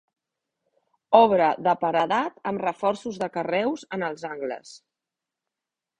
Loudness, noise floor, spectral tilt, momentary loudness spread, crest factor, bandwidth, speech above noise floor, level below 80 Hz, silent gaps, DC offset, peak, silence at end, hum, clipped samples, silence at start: -24 LUFS; -88 dBFS; -5.5 dB/octave; 14 LU; 24 dB; 10 kHz; 64 dB; -68 dBFS; none; under 0.1%; -2 dBFS; 1.2 s; none; under 0.1%; 1.1 s